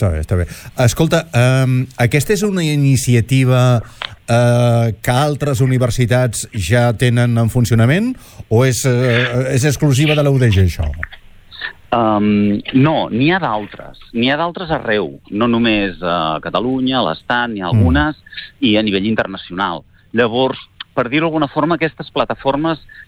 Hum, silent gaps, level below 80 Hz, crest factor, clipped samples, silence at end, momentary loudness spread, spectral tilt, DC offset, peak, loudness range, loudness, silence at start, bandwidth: none; none; -34 dBFS; 12 dB; under 0.1%; 0.05 s; 9 LU; -6 dB/octave; under 0.1%; -2 dBFS; 3 LU; -15 LUFS; 0 s; 18 kHz